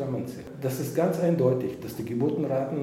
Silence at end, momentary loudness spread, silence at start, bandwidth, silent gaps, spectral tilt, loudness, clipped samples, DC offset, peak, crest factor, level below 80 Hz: 0 s; 10 LU; 0 s; 16.5 kHz; none; -7.5 dB/octave; -28 LUFS; under 0.1%; under 0.1%; -10 dBFS; 18 dB; -62 dBFS